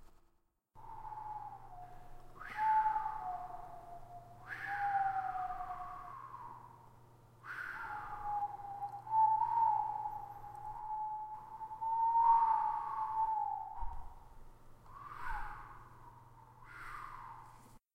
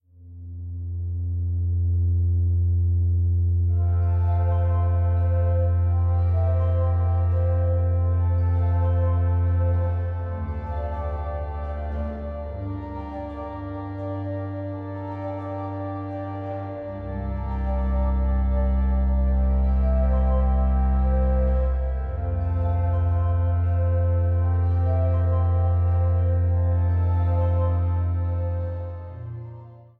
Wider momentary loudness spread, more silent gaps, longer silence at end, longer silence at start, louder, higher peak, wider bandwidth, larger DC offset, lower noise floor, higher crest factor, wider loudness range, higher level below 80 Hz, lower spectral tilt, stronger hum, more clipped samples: first, 23 LU vs 10 LU; neither; about the same, 0.2 s vs 0.2 s; second, 0 s vs 0.2 s; second, -37 LUFS vs -24 LUFS; second, -20 dBFS vs -12 dBFS; first, 12.5 kHz vs 2.5 kHz; neither; first, -74 dBFS vs -42 dBFS; first, 20 dB vs 10 dB; first, 12 LU vs 9 LU; second, -56 dBFS vs -28 dBFS; second, -5 dB/octave vs -12 dB/octave; neither; neither